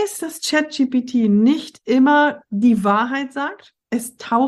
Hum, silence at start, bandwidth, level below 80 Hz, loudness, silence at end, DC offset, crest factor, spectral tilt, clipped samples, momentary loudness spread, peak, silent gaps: none; 0 s; 12.5 kHz; -64 dBFS; -18 LUFS; 0 s; under 0.1%; 14 dB; -5 dB/octave; under 0.1%; 11 LU; -4 dBFS; none